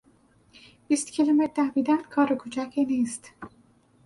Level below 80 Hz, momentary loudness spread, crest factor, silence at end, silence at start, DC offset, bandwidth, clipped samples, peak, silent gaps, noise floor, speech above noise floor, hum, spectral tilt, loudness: -68 dBFS; 17 LU; 16 dB; 0.6 s; 0.9 s; under 0.1%; 11.5 kHz; under 0.1%; -10 dBFS; none; -61 dBFS; 36 dB; none; -4 dB/octave; -25 LUFS